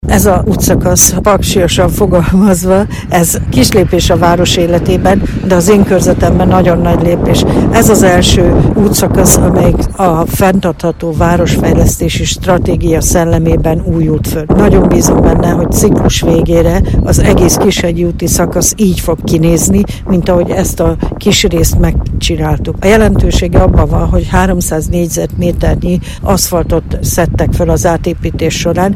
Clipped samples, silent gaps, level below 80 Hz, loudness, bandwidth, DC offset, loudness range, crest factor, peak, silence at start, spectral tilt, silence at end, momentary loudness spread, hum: 1%; none; -16 dBFS; -9 LUFS; over 20 kHz; under 0.1%; 3 LU; 8 dB; 0 dBFS; 0.05 s; -5 dB/octave; 0 s; 6 LU; none